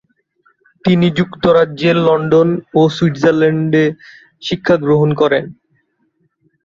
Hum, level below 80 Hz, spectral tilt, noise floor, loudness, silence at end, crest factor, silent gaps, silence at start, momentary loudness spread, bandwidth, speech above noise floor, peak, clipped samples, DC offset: none; -52 dBFS; -7.5 dB/octave; -63 dBFS; -13 LUFS; 1.1 s; 14 dB; none; 0.85 s; 8 LU; 7.4 kHz; 50 dB; -2 dBFS; under 0.1%; under 0.1%